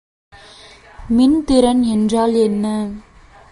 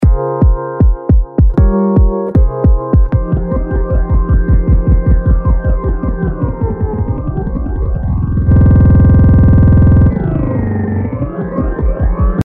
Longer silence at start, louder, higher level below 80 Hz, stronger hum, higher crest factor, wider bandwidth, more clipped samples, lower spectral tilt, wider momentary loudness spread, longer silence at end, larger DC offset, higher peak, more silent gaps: first, 1 s vs 0 s; second, -15 LUFS vs -12 LUFS; second, -40 dBFS vs -14 dBFS; neither; first, 16 dB vs 10 dB; first, 11.5 kHz vs 2.6 kHz; neither; second, -6 dB/octave vs -12.5 dB/octave; about the same, 10 LU vs 10 LU; first, 0.5 s vs 0.05 s; neither; about the same, -2 dBFS vs 0 dBFS; neither